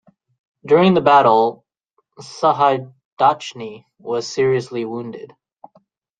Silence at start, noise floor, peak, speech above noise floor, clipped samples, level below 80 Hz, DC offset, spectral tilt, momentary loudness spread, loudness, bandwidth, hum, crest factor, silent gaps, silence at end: 0.65 s; -68 dBFS; -2 dBFS; 52 dB; under 0.1%; -62 dBFS; under 0.1%; -6 dB/octave; 21 LU; -17 LUFS; 9.2 kHz; none; 18 dB; 3.05-3.17 s; 0.95 s